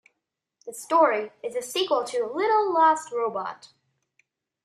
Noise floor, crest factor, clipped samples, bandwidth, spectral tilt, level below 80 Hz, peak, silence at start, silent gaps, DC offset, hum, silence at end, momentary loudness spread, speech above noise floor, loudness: -82 dBFS; 18 dB; under 0.1%; 14.5 kHz; -2.5 dB/octave; -80 dBFS; -8 dBFS; 0.65 s; none; under 0.1%; none; 1 s; 16 LU; 58 dB; -24 LUFS